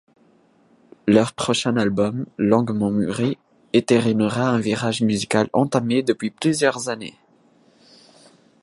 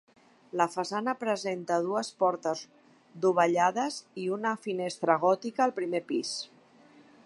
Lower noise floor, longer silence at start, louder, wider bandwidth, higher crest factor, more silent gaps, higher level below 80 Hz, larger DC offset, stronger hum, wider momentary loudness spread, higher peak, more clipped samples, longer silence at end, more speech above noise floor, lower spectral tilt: about the same, -57 dBFS vs -58 dBFS; first, 1.05 s vs 0.55 s; first, -21 LUFS vs -29 LUFS; about the same, 11.5 kHz vs 11.5 kHz; about the same, 20 dB vs 22 dB; neither; first, -58 dBFS vs -84 dBFS; neither; neither; about the same, 7 LU vs 9 LU; first, -2 dBFS vs -8 dBFS; neither; first, 1.5 s vs 0.8 s; first, 37 dB vs 29 dB; about the same, -5.5 dB/octave vs -4.5 dB/octave